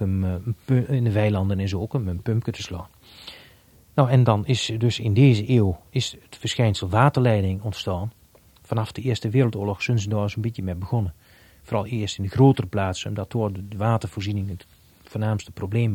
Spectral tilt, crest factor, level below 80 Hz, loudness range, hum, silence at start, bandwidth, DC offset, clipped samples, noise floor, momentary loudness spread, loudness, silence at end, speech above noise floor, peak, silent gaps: -7 dB/octave; 20 dB; -50 dBFS; 5 LU; none; 0 s; 14 kHz; under 0.1%; under 0.1%; -54 dBFS; 12 LU; -23 LUFS; 0 s; 32 dB; -2 dBFS; none